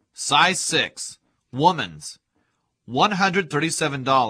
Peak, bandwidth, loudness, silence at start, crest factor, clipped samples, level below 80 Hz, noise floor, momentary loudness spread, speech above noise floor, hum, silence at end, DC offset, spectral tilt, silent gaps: -2 dBFS; 14.5 kHz; -21 LUFS; 0.2 s; 20 dB; under 0.1%; -64 dBFS; -71 dBFS; 17 LU; 49 dB; none; 0 s; under 0.1%; -3 dB/octave; none